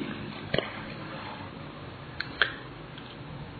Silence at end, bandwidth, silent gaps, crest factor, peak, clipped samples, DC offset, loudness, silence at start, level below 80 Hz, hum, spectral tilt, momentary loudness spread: 0 s; 4.8 kHz; none; 32 dB; -4 dBFS; under 0.1%; under 0.1%; -35 LUFS; 0 s; -56 dBFS; none; -2.5 dB/octave; 14 LU